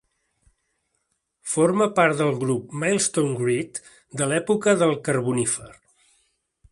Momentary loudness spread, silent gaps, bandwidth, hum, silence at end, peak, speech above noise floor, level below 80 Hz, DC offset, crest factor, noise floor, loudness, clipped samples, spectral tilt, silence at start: 9 LU; none; 11.5 kHz; none; 1 s; -4 dBFS; 52 dB; -62 dBFS; under 0.1%; 20 dB; -74 dBFS; -22 LUFS; under 0.1%; -4.5 dB/octave; 1.45 s